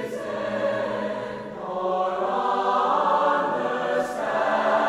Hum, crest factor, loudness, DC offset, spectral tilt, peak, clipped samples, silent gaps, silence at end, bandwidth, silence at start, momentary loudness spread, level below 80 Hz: none; 16 dB; -24 LUFS; under 0.1%; -5 dB/octave; -8 dBFS; under 0.1%; none; 0 s; 13.5 kHz; 0 s; 9 LU; -62 dBFS